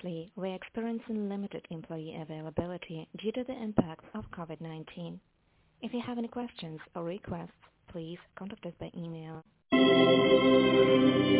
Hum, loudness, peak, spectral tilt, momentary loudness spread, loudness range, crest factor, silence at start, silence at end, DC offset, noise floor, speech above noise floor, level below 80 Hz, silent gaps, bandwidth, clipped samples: none; -29 LUFS; -10 dBFS; -4.5 dB/octave; 21 LU; 14 LU; 22 dB; 0.05 s; 0 s; under 0.1%; -68 dBFS; 38 dB; -60 dBFS; none; 4 kHz; under 0.1%